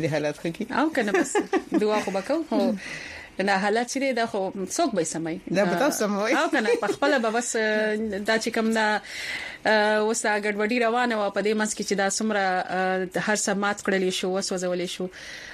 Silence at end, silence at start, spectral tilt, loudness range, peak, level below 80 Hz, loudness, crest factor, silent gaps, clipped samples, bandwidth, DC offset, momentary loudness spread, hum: 0 s; 0 s; -3.5 dB/octave; 2 LU; -8 dBFS; -62 dBFS; -25 LUFS; 16 dB; none; under 0.1%; 15 kHz; under 0.1%; 7 LU; none